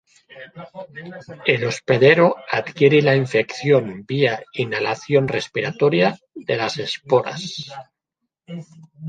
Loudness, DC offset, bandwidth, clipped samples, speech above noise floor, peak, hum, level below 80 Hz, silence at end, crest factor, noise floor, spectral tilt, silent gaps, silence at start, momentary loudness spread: -19 LUFS; under 0.1%; 9.2 kHz; under 0.1%; 60 dB; -2 dBFS; none; -62 dBFS; 0 s; 18 dB; -80 dBFS; -6 dB/octave; none; 0.35 s; 21 LU